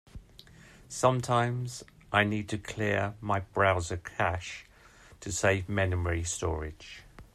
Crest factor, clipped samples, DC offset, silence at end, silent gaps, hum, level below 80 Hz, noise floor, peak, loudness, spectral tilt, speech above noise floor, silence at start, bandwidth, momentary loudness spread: 22 dB; under 0.1%; under 0.1%; 0.1 s; none; none; -52 dBFS; -56 dBFS; -8 dBFS; -30 LUFS; -5 dB/octave; 26 dB; 0.15 s; 13.5 kHz; 17 LU